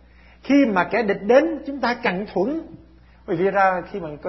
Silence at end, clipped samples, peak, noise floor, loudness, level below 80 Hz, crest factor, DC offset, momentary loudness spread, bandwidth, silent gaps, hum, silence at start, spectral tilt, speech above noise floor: 0 s; under 0.1%; -2 dBFS; -49 dBFS; -21 LUFS; -52 dBFS; 20 dB; under 0.1%; 11 LU; 6 kHz; none; none; 0.45 s; -7 dB/octave; 29 dB